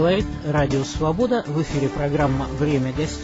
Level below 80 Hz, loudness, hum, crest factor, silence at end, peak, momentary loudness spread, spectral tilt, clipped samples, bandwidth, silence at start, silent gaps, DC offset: -36 dBFS; -22 LUFS; none; 14 dB; 0 s; -6 dBFS; 3 LU; -6.5 dB/octave; under 0.1%; 8 kHz; 0 s; none; under 0.1%